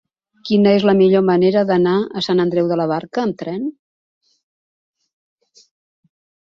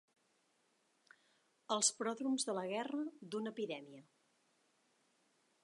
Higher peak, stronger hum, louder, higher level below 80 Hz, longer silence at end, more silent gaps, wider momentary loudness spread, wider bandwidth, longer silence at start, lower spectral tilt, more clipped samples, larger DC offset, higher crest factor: first, -2 dBFS vs -18 dBFS; neither; first, -16 LUFS vs -39 LUFS; first, -60 dBFS vs under -90 dBFS; first, 2.8 s vs 1.6 s; neither; about the same, 12 LU vs 10 LU; second, 7.2 kHz vs 11.5 kHz; second, 0.45 s vs 1.7 s; first, -7.5 dB/octave vs -2.5 dB/octave; neither; neither; second, 16 dB vs 26 dB